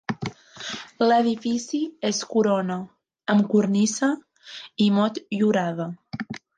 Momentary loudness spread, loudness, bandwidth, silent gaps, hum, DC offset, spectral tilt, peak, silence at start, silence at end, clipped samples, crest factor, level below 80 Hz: 15 LU; -23 LUFS; 9.6 kHz; none; none; under 0.1%; -5 dB/octave; -6 dBFS; 0.1 s; 0.2 s; under 0.1%; 18 dB; -66 dBFS